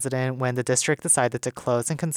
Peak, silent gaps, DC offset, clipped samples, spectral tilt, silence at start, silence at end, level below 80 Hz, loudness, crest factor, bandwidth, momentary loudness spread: -10 dBFS; none; under 0.1%; under 0.1%; -4 dB/octave; 0 s; 0 s; -62 dBFS; -23 LUFS; 16 dB; 18 kHz; 6 LU